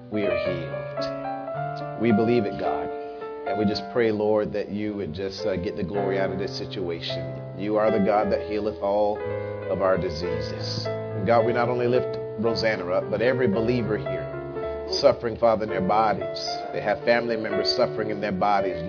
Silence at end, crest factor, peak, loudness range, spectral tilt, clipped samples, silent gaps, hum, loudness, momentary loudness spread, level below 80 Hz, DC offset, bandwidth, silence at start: 0 s; 20 dB; -4 dBFS; 3 LU; -6.5 dB/octave; under 0.1%; none; none; -25 LUFS; 9 LU; -52 dBFS; under 0.1%; 5.4 kHz; 0 s